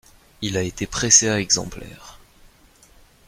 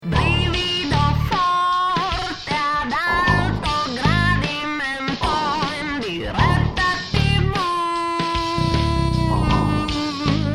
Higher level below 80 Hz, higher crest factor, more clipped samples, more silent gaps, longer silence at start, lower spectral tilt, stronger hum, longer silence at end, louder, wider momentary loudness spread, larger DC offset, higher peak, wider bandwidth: second, -46 dBFS vs -30 dBFS; first, 24 dB vs 16 dB; neither; neither; first, 0.4 s vs 0 s; second, -2 dB/octave vs -5.5 dB/octave; neither; first, 1.15 s vs 0 s; about the same, -18 LUFS vs -20 LUFS; first, 22 LU vs 5 LU; neither; first, 0 dBFS vs -4 dBFS; first, 16 kHz vs 14 kHz